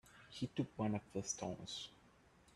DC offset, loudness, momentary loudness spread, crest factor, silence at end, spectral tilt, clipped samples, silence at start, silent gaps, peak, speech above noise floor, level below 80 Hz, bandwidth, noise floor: under 0.1%; -44 LUFS; 9 LU; 20 dB; 0.05 s; -4.5 dB/octave; under 0.1%; 0.05 s; none; -26 dBFS; 25 dB; -72 dBFS; 12.5 kHz; -68 dBFS